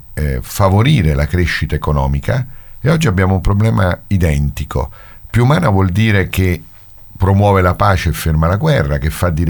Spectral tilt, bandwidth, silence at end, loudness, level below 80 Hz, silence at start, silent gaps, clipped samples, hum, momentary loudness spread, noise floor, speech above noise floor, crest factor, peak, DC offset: -6.5 dB/octave; 19.5 kHz; 0 s; -14 LUFS; -24 dBFS; 0.1 s; none; under 0.1%; none; 8 LU; -36 dBFS; 23 dB; 14 dB; 0 dBFS; under 0.1%